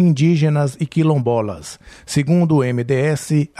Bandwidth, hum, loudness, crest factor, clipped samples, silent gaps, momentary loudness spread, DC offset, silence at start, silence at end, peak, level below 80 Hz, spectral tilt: 12.5 kHz; none; -17 LUFS; 10 dB; under 0.1%; none; 11 LU; under 0.1%; 0 s; 0.15 s; -6 dBFS; -52 dBFS; -7 dB/octave